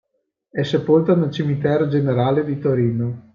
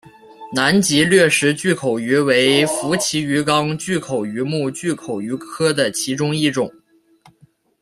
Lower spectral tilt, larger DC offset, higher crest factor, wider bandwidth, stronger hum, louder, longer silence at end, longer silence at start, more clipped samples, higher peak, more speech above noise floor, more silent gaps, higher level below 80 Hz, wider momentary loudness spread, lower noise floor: first, -9 dB/octave vs -4 dB/octave; neither; about the same, 14 dB vs 18 dB; second, 7.2 kHz vs 15.5 kHz; neither; about the same, -19 LUFS vs -18 LUFS; second, 0.15 s vs 1.1 s; first, 0.55 s vs 0.4 s; neither; about the same, -4 dBFS vs -2 dBFS; first, 54 dB vs 37 dB; neither; about the same, -60 dBFS vs -58 dBFS; second, 7 LU vs 11 LU; first, -72 dBFS vs -55 dBFS